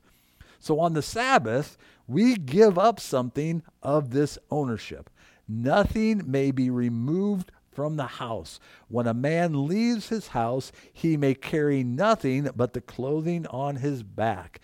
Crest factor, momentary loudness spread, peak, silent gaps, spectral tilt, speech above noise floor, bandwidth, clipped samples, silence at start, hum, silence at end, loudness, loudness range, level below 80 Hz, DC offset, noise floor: 20 dB; 10 LU; -6 dBFS; none; -6.5 dB/octave; 30 dB; 16 kHz; under 0.1%; 0.65 s; none; 0.05 s; -26 LUFS; 4 LU; -52 dBFS; under 0.1%; -56 dBFS